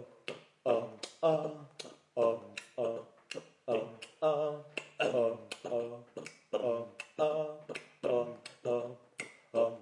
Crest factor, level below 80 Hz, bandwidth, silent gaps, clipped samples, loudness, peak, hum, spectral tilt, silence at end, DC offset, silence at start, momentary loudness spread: 20 dB; -90 dBFS; 11.5 kHz; none; under 0.1%; -36 LUFS; -16 dBFS; none; -5 dB/octave; 0 s; under 0.1%; 0 s; 14 LU